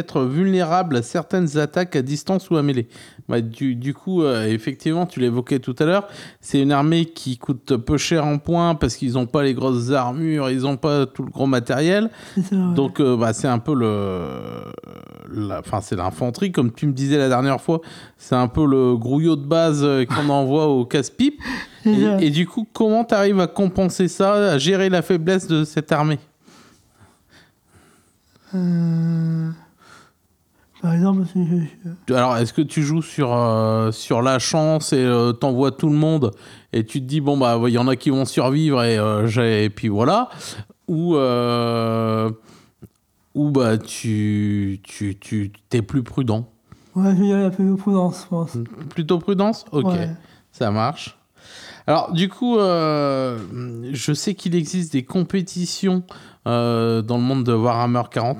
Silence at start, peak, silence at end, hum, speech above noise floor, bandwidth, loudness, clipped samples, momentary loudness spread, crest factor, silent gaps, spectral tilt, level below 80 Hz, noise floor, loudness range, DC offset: 0 s; -4 dBFS; 0 s; none; 43 dB; 15 kHz; -20 LUFS; under 0.1%; 10 LU; 16 dB; none; -6.5 dB/octave; -50 dBFS; -62 dBFS; 5 LU; under 0.1%